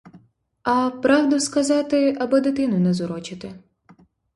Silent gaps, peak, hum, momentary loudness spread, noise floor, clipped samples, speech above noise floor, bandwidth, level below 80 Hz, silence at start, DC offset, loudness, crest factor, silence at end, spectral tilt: none; -4 dBFS; none; 13 LU; -54 dBFS; under 0.1%; 34 dB; 11.5 kHz; -60 dBFS; 0.15 s; under 0.1%; -20 LUFS; 18 dB; 0.75 s; -5.5 dB/octave